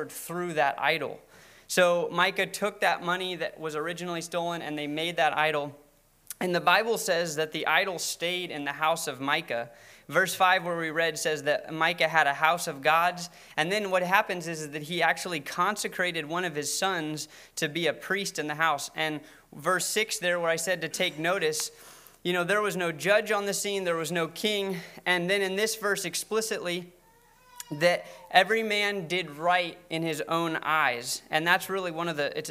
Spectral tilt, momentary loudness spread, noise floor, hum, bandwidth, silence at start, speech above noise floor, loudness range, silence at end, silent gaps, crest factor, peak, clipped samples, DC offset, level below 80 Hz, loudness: -3 dB/octave; 9 LU; -60 dBFS; none; 16 kHz; 0 s; 31 dB; 3 LU; 0 s; none; 24 dB; -6 dBFS; under 0.1%; under 0.1%; -70 dBFS; -27 LUFS